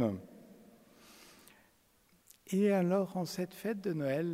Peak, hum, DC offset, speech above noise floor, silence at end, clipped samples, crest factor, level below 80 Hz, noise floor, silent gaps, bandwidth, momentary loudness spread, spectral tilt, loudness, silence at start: -20 dBFS; none; under 0.1%; 36 dB; 0 s; under 0.1%; 16 dB; -76 dBFS; -69 dBFS; none; 16 kHz; 26 LU; -7 dB/octave; -34 LUFS; 0 s